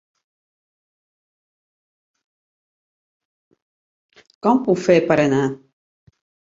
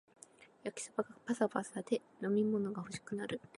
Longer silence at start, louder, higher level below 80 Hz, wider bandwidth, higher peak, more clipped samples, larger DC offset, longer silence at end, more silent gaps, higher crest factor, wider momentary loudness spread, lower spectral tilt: first, 4.45 s vs 0.4 s; first, -18 LUFS vs -38 LUFS; first, -62 dBFS vs -78 dBFS; second, 7.8 kHz vs 11.5 kHz; first, -2 dBFS vs -18 dBFS; neither; neither; first, 0.95 s vs 0.2 s; neither; about the same, 22 dB vs 22 dB; second, 9 LU vs 12 LU; about the same, -6.5 dB/octave vs -5.5 dB/octave